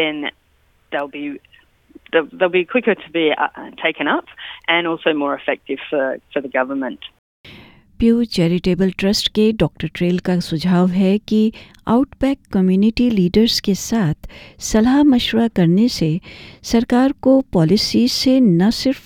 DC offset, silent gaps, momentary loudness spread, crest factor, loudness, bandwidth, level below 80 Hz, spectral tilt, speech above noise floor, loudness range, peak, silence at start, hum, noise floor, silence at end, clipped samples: under 0.1%; 7.19-7.44 s; 11 LU; 16 dB; -17 LUFS; 16.5 kHz; -42 dBFS; -5.5 dB/octave; 41 dB; 5 LU; -2 dBFS; 0 s; none; -58 dBFS; 0.05 s; under 0.1%